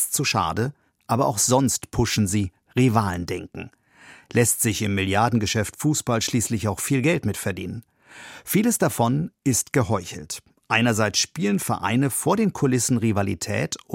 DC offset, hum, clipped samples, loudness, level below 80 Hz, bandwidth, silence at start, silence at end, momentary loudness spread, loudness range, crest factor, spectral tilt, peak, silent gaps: under 0.1%; none; under 0.1%; -22 LUFS; -50 dBFS; 16.5 kHz; 0 s; 0 s; 11 LU; 2 LU; 20 dB; -4.5 dB/octave; -2 dBFS; none